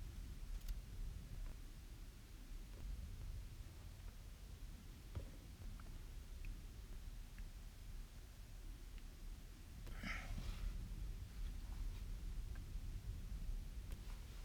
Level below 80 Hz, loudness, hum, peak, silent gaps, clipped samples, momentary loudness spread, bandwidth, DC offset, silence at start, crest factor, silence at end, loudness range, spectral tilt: -50 dBFS; -54 LUFS; none; -34 dBFS; none; under 0.1%; 7 LU; 19.5 kHz; under 0.1%; 0 s; 16 dB; 0 s; 6 LU; -5 dB/octave